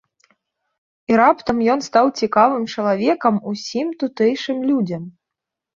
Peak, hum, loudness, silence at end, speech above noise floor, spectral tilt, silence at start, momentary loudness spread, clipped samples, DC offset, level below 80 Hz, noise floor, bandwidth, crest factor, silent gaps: 0 dBFS; none; -18 LUFS; 0.65 s; 66 dB; -5.5 dB/octave; 1.1 s; 10 LU; under 0.1%; under 0.1%; -60 dBFS; -84 dBFS; 7.4 kHz; 18 dB; none